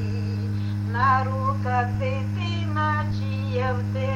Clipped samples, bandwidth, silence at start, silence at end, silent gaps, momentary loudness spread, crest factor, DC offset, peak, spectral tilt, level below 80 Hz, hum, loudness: under 0.1%; 7.2 kHz; 0 s; 0 s; none; 7 LU; 16 dB; under 0.1%; -8 dBFS; -7.5 dB/octave; -46 dBFS; none; -25 LUFS